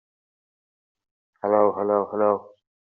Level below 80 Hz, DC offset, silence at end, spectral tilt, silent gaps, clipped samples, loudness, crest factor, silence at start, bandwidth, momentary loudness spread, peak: -74 dBFS; under 0.1%; 0.5 s; -9 dB/octave; none; under 0.1%; -23 LUFS; 20 dB; 1.45 s; 2.7 kHz; 7 LU; -6 dBFS